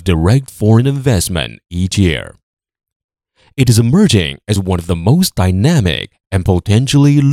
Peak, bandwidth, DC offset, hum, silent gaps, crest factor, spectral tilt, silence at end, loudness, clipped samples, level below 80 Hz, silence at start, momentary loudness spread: 0 dBFS; 16 kHz; under 0.1%; none; 2.43-2.57 s, 2.96-3.09 s; 12 dB; -6 dB/octave; 0 s; -13 LUFS; under 0.1%; -36 dBFS; 0 s; 10 LU